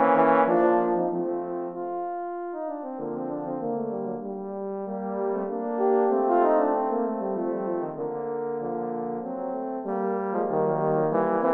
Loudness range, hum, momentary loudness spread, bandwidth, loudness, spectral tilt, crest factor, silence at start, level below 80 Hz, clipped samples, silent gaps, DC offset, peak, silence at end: 6 LU; none; 11 LU; 4.1 kHz; -27 LUFS; -10.5 dB/octave; 20 dB; 0 s; -74 dBFS; under 0.1%; none; under 0.1%; -6 dBFS; 0 s